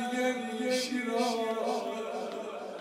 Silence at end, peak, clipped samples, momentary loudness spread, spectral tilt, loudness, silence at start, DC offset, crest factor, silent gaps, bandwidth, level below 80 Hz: 0 s; -16 dBFS; under 0.1%; 7 LU; -3 dB/octave; -32 LUFS; 0 s; under 0.1%; 16 dB; none; 16 kHz; -80 dBFS